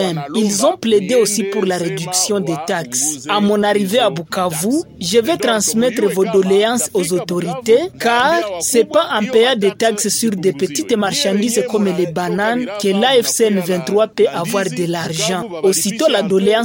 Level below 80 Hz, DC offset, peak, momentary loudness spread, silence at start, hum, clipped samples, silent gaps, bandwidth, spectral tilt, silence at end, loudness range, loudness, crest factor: -58 dBFS; under 0.1%; 0 dBFS; 5 LU; 0 s; none; under 0.1%; none; 17 kHz; -3.5 dB/octave; 0 s; 2 LU; -16 LUFS; 16 dB